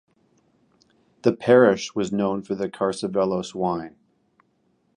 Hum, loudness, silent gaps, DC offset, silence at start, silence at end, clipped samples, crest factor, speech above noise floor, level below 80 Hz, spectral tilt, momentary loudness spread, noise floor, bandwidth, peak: none; -22 LUFS; none; under 0.1%; 1.25 s; 1.05 s; under 0.1%; 22 dB; 45 dB; -62 dBFS; -6 dB/octave; 11 LU; -67 dBFS; 10.5 kHz; -2 dBFS